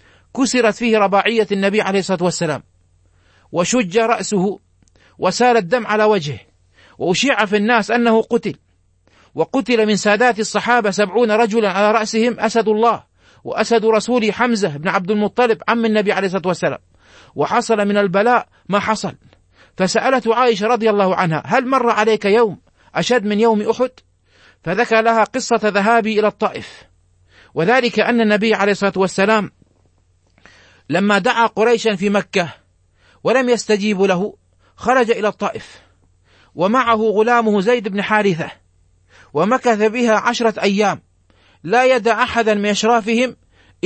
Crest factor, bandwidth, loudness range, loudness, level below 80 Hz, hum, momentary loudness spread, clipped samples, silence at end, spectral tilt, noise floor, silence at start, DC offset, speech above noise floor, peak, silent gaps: 16 dB; 8.8 kHz; 2 LU; -16 LUFS; -56 dBFS; none; 8 LU; under 0.1%; 0.5 s; -4.5 dB/octave; -57 dBFS; 0.35 s; under 0.1%; 42 dB; 0 dBFS; none